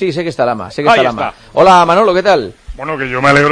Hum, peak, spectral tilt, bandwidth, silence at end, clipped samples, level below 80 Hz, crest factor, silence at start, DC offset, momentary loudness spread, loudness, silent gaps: none; 0 dBFS; -5.5 dB/octave; 10.5 kHz; 0 s; 0.3%; -38 dBFS; 12 dB; 0 s; under 0.1%; 13 LU; -11 LUFS; none